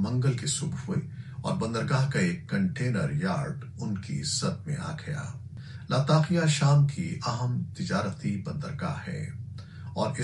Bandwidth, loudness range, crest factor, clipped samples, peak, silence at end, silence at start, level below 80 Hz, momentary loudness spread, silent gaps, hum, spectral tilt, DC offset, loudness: 11.5 kHz; 5 LU; 20 dB; under 0.1%; -10 dBFS; 0 s; 0 s; -58 dBFS; 13 LU; none; none; -5.5 dB/octave; under 0.1%; -29 LUFS